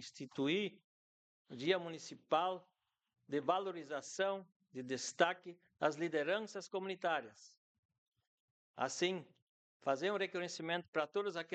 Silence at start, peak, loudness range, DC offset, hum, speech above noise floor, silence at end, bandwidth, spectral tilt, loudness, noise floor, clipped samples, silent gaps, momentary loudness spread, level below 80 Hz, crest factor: 0 s; -16 dBFS; 3 LU; under 0.1%; none; over 51 dB; 0 s; 9 kHz; -4 dB/octave; -39 LUFS; under -90 dBFS; under 0.1%; 0.84-1.45 s, 4.56-4.60 s, 7.57-7.89 s, 7.98-8.12 s, 8.27-8.74 s, 9.42-9.80 s, 10.88-10.93 s; 12 LU; under -90 dBFS; 24 dB